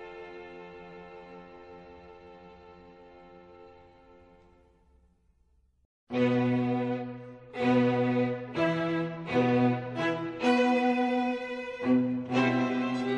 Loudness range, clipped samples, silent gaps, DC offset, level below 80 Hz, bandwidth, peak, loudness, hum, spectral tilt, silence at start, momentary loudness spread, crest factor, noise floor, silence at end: 21 LU; under 0.1%; 5.85-6.07 s; under 0.1%; -66 dBFS; 8.4 kHz; -14 dBFS; -28 LUFS; none; -7 dB/octave; 0 s; 23 LU; 16 dB; -67 dBFS; 0 s